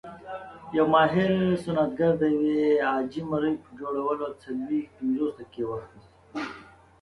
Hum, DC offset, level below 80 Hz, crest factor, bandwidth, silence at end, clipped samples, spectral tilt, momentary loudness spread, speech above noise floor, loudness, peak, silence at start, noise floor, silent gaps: none; under 0.1%; -60 dBFS; 18 dB; 11.5 kHz; 0.35 s; under 0.1%; -8 dB/octave; 16 LU; 23 dB; -26 LUFS; -8 dBFS; 0.05 s; -48 dBFS; none